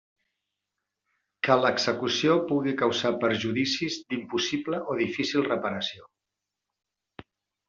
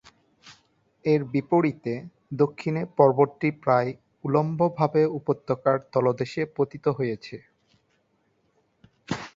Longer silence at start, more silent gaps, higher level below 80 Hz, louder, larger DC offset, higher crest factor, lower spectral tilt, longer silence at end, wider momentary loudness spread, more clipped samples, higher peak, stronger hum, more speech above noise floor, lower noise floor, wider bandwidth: first, 1.45 s vs 0.45 s; neither; about the same, -70 dBFS vs -66 dBFS; about the same, -26 LUFS vs -25 LUFS; neither; about the same, 20 dB vs 22 dB; second, -4.5 dB/octave vs -8 dB/octave; first, 1.65 s vs 0.05 s; second, 8 LU vs 13 LU; neither; second, -8 dBFS vs -4 dBFS; neither; first, 60 dB vs 45 dB; first, -86 dBFS vs -69 dBFS; about the same, 7.6 kHz vs 7.6 kHz